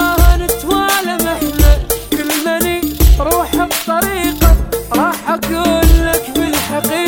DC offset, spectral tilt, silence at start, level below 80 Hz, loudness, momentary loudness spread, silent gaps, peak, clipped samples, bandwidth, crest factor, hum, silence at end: 0.2%; -4.5 dB/octave; 0 s; -16 dBFS; -14 LUFS; 5 LU; none; 0 dBFS; 0.2%; 19.5 kHz; 12 dB; none; 0 s